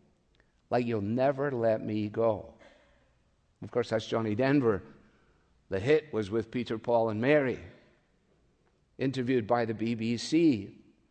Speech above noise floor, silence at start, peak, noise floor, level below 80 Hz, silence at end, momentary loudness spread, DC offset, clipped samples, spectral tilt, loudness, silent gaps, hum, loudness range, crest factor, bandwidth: 41 dB; 0.7 s; -12 dBFS; -69 dBFS; -68 dBFS; 0.35 s; 9 LU; under 0.1%; under 0.1%; -7 dB/octave; -30 LUFS; none; none; 2 LU; 20 dB; 9.2 kHz